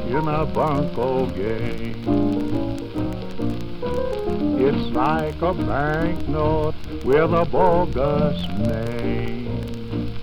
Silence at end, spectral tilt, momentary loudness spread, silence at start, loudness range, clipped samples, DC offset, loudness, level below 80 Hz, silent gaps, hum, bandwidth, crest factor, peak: 0 s; -8 dB/octave; 10 LU; 0 s; 4 LU; under 0.1%; under 0.1%; -23 LUFS; -34 dBFS; none; none; 15.5 kHz; 16 dB; -4 dBFS